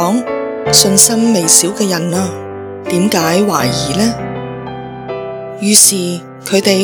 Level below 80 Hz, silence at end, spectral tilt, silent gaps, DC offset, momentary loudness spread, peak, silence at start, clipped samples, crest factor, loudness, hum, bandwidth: -44 dBFS; 0 s; -3 dB/octave; none; under 0.1%; 18 LU; 0 dBFS; 0 s; 0.5%; 14 dB; -11 LUFS; none; over 20 kHz